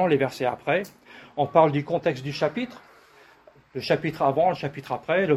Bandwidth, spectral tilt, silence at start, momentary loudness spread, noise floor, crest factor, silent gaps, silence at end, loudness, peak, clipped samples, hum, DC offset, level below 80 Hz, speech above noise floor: 15 kHz; -6.5 dB/octave; 0 s; 14 LU; -54 dBFS; 20 dB; none; 0 s; -25 LUFS; -4 dBFS; under 0.1%; none; under 0.1%; -62 dBFS; 30 dB